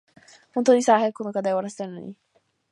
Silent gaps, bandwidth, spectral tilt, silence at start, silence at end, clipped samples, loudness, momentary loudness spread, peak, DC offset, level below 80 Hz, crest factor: none; 11.5 kHz; -5 dB/octave; 0.55 s; 0.6 s; under 0.1%; -22 LUFS; 18 LU; -4 dBFS; under 0.1%; -78 dBFS; 20 dB